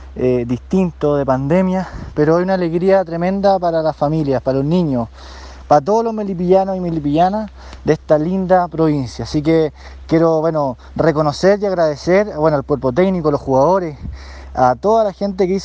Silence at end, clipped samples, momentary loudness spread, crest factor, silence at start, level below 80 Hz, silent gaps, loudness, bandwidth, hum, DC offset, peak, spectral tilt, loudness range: 0 s; under 0.1%; 8 LU; 16 dB; 0 s; -38 dBFS; none; -16 LUFS; 8.2 kHz; none; under 0.1%; 0 dBFS; -7.5 dB/octave; 1 LU